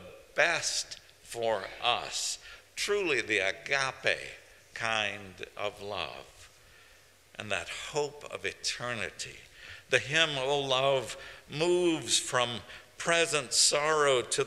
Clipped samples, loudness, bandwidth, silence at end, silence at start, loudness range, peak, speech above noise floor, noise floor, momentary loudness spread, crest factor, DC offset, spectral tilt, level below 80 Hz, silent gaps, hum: under 0.1%; -29 LUFS; 15.5 kHz; 0 s; 0 s; 9 LU; -8 dBFS; 29 dB; -59 dBFS; 17 LU; 24 dB; under 0.1%; -2 dB/octave; -64 dBFS; none; none